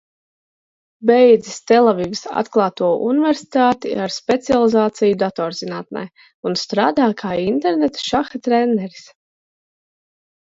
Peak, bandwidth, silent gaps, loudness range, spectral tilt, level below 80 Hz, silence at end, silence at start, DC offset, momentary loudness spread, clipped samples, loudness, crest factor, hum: 0 dBFS; 7.8 kHz; 6.34-6.43 s; 4 LU; -5 dB/octave; -58 dBFS; 1.55 s; 1 s; under 0.1%; 10 LU; under 0.1%; -17 LUFS; 18 dB; none